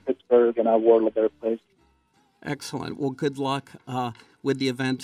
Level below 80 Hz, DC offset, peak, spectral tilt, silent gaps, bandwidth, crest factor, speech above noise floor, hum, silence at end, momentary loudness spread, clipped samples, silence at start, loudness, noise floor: -70 dBFS; under 0.1%; -6 dBFS; -6 dB/octave; none; 14 kHz; 18 dB; 41 dB; none; 0 s; 14 LU; under 0.1%; 0.05 s; -25 LUFS; -65 dBFS